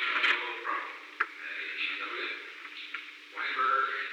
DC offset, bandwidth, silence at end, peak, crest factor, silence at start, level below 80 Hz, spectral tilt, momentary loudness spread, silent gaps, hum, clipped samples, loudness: under 0.1%; 17.5 kHz; 0 s; -14 dBFS; 20 dB; 0 s; under -90 dBFS; 1.5 dB/octave; 14 LU; none; none; under 0.1%; -32 LUFS